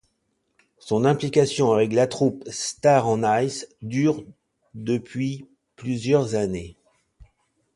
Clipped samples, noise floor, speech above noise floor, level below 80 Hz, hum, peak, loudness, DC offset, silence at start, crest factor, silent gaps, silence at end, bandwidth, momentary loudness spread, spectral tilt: under 0.1%; -73 dBFS; 51 dB; -56 dBFS; none; -4 dBFS; -23 LUFS; under 0.1%; 0.85 s; 18 dB; none; 1.05 s; 11.5 kHz; 13 LU; -5.5 dB/octave